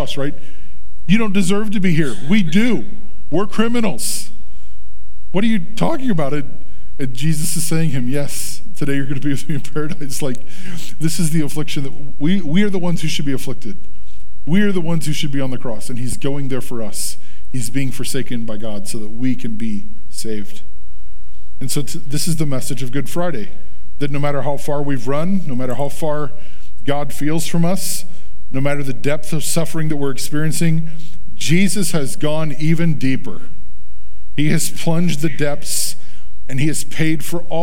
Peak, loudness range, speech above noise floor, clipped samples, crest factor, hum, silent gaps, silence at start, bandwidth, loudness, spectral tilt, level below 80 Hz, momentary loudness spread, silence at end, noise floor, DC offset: 0 dBFS; 5 LU; 22 dB; under 0.1%; 20 dB; none; none; 0 s; 17.5 kHz; -21 LUFS; -5 dB/octave; -44 dBFS; 12 LU; 0 s; -42 dBFS; 30%